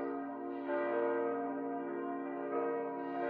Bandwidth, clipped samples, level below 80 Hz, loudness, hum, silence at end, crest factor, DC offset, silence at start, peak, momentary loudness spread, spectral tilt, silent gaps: 4.5 kHz; under 0.1%; under -90 dBFS; -38 LUFS; none; 0 s; 14 dB; under 0.1%; 0 s; -24 dBFS; 6 LU; -5 dB/octave; none